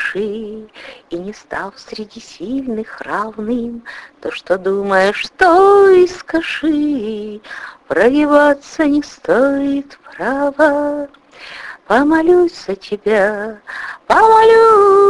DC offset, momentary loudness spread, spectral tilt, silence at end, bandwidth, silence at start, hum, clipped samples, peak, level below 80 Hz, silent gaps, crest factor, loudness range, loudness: under 0.1%; 22 LU; -5 dB/octave; 0 s; 11.5 kHz; 0 s; none; under 0.1%; 0 dBFS; -48 dBFS; none; 14 dB; 11 LU; -13 LUFS